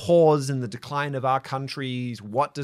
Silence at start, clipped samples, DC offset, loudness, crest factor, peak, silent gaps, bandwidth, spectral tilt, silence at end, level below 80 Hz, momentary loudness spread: 0 s; under 0.1%; under 0.1%; -25 LUFS; 16 dB; -8 dBFS; none; 13.5 kHz; -6.5 dB/octave; 0 s; -66 dBFS; 12 LU